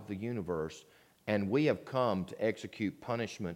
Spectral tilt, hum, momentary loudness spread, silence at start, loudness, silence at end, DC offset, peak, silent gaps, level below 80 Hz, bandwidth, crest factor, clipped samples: -6.5 dB/octave; none; 8 LU; 0 s; -35 LUFS; 0 s; under 0.1%; -16 dBFS; none; -66 dBFS; 16.5 kHz; 18 dB; under 0.1%